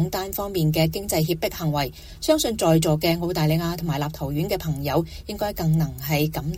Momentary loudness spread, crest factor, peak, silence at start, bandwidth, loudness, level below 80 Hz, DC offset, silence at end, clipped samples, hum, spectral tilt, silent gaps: 7 LU; 18 dB; -6 dBFS; 0 s; 17 kHz; -23 LUFS; -42 dBFS; under 0.1%; 0 s; under 0.1%; none; -5.5 dB/octave; none